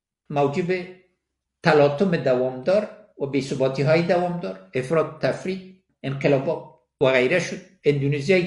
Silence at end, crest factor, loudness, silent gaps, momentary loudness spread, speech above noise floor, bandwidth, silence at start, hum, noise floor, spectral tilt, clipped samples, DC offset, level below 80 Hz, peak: 0 s; 20 dB; -22 LUFS; none; 13 LU; 57 dB; 11.5 kHz; 0.3 s; none; -78 dBFS; -6.5 dB/octave; under 0.1%; under 0.1%; -62 dBFS; -2 dBFS